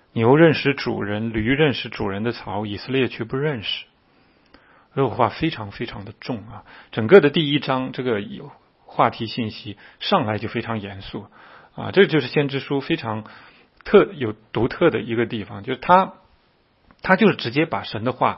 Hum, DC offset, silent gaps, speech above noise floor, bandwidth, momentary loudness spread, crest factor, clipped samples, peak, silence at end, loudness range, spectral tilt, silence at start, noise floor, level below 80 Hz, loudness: none; under 0.1%; none; 40 dB; 5.8 kHz; 16 LU; 22 dB; under 0.1%; 0 dBFS; 0 s; 6 LU; -9 dB/octave; 0.15 s; -60 dBFS; -50 dBFS; -21 LUFS